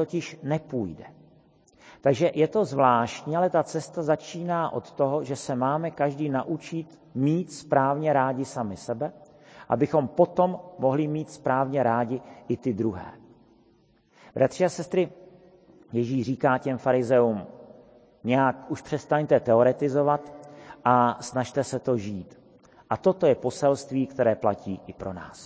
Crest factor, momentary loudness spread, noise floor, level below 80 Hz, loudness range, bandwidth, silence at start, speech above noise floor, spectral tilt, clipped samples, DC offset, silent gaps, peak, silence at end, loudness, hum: 20 dB; 13 LU; -62 dBFS; -60 dBFS; 4 LU; 8 kHz; 0 s; 37 dB; -7 dB/octave; under 0.1%; under 0.1%; none; -6 dBFS; 0 s; -26 LUFS; none